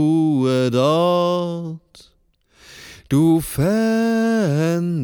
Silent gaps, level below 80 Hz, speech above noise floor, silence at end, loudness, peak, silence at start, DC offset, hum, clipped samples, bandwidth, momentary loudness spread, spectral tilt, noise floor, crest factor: none; -50 dBFS; 40 dB; 0 s; -18 LUFS; -4 dBFS; 0 s; under 0.1%; none; under 0.1%; 19.5 kHz; 14 LU; -7 dB/octave; -58 dBFS; 14 dB